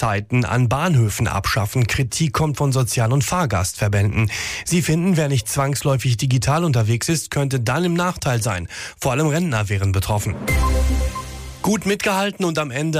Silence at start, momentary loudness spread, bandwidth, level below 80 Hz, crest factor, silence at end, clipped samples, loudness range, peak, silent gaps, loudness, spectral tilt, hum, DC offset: 0 s; 4 LU; 15.5 kHz; -30 dBFS; 10 dB; 0 s; under 0.1%; 2 LU; -8 dBFS; none; -20 LUFS; -5 dB/octave; none; under 0.1%